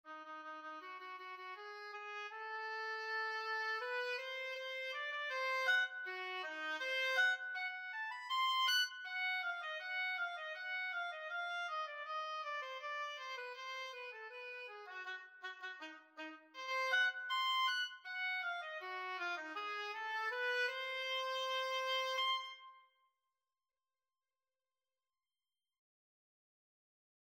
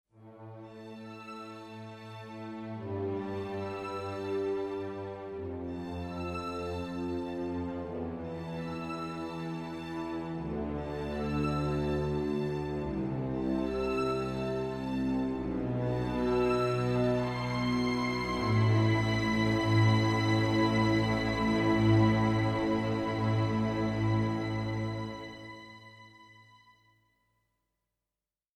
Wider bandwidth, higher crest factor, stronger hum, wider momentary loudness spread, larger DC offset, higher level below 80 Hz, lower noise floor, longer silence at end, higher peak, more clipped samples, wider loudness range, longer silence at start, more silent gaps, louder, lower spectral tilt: first, 16 kHz vs 10.5 kHz; about the same, 18 dB vs 18 dB; neither; second, 14 LU vs 17 LU; neither; second, under -90 dBFS vs -50 dBFS; about the same, under -90 dBFS vs under -90 dBFS; first, 4.55 s vs 2.15 s; second, -24 dBFS vs -14 dBFS; neither; second, 8 LU vs 11 LU; second, 0.05 s vs 0.2 s; neither; second, -40 LUFS vs -31 LUFS; second, 3 dB/octave vs -7 dB/octave